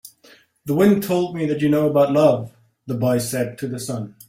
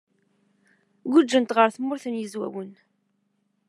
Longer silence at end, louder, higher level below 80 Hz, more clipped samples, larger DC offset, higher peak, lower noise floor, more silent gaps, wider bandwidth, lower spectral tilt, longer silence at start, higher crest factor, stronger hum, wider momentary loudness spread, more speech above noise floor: second, 0.2 s vs 0.95 s; first, -20 LUFS vs -23 LUFS; first, -58 dBFS vs -88 dBFS; neither; neither; about the same, -2 dBFS vs -2 dBFS; second, -52 dBFS vs -72 dBFS; neither; first, 16.5 kHz vs 11 kHz; first, -6.5 dB/octave vs -4.5 dB/octave; second, 0.05 s vs 1.05 s; second, 18 dB vs 24 dB; neither; second, 12 LU vs 18 LU; second, 33 dB vs 49 dB